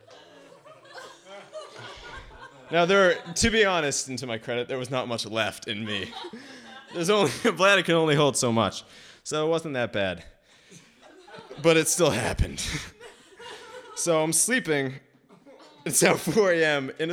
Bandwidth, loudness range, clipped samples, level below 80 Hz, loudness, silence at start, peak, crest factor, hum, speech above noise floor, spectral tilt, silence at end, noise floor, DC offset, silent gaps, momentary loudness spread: 18 kHz; 5 LU; under 0.1%; -46 dBFS; -24 LUFS; 0.1 s; -4 dBFS; 22 dB; none; 29 dB; -3.5 dB/octave; 0 s; -53 dBFS; under 0.1%; none; 22 LU